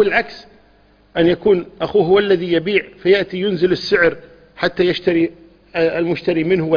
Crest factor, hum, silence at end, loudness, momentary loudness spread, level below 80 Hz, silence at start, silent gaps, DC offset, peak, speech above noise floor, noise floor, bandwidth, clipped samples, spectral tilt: 16 dB; none; 0 s; -17 LUFS; 8 LU; -48 dBFS; 0 s; none; under 0.1%; 0 dBFS; 35 dB; -52 dBFS; 5.2 kHz; under 0.1%; -7 dB/octave